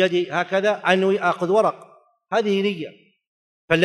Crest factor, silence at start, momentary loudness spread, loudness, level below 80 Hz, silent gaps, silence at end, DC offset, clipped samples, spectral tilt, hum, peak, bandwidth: 20 dB; 0 s; 7 LU; -21 LUFS; -62 dBFS; 3.27-3.68 s; 0 s; under 0.1%; under 0.1%; -5.5 dB/octave; none; -2 dBFS; 11.5 kHz